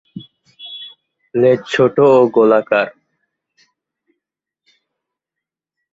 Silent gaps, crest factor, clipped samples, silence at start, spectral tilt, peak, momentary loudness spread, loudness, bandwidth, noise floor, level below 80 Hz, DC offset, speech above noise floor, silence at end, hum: none; 16 dB; under 0.1%; 0.15 s; -6.5 dB/octave; -2 dBFS; 25 LU; -13 LUFS; 7.8 kHz; -84 dBFS; -62 dBFS; under 0.1%; 72 dB; 3.05 s; none